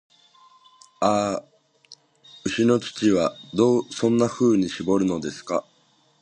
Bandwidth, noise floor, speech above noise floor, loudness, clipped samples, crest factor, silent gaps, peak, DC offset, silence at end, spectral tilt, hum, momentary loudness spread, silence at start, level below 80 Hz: 9.6 kHz; -62 dBFS; 40 dB; -23 LUFS; under 0.1%; 18 dB; none; -6 dBFS; under 0.1%; 0.6 s; -5.5 dB/octave; none; 8 LU; 1 s; -58 dBFS